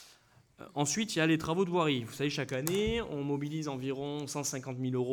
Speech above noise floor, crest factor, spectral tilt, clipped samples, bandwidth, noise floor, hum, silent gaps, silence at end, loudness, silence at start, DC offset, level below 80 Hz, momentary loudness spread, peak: 30 dB; 20 dB; -4.5 dB/octave; under 0.1%; over 20 kHz; -63 dBFS; none; none; 0 s; -33 LUFS; 0 s; under 0.1%; -56 dBFS; 7 LU; -14 dBFS